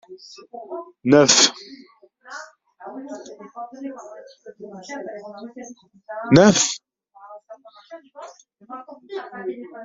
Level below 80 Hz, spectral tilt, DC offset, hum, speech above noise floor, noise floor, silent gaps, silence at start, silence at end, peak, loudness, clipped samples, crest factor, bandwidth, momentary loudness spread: -58 dBFS; -3.5 dB/octave; under 0.1%; none; 29 dB; -50 dBFS; none; 0.1 s; 0 s; 0 dBFS; -16 LUFS; under 0.1%; 24 dB; 8 kHz; 28 LU